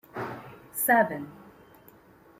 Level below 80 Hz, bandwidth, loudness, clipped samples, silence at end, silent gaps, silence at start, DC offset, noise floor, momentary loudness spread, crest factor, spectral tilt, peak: -70 dBFS; 16.5 kHz; -27 LUFS; under 0.1%; 0.9 s; none; 0.15 s; under 0.1%; -56 dBFS; 20 LU; 22 dB; -4.5 dB/octave; -10 dBFS